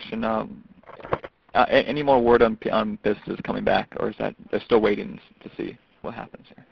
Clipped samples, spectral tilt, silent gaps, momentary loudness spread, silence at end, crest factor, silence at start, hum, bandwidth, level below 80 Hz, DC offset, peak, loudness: under 0.1%; -8 dB/octave; none; 18 LU; 0.45 s; 22 dB; 0 s; none; 6.2 kHz; -50 dBFS; under 0.1%; -2 dBFS; -23 LUFS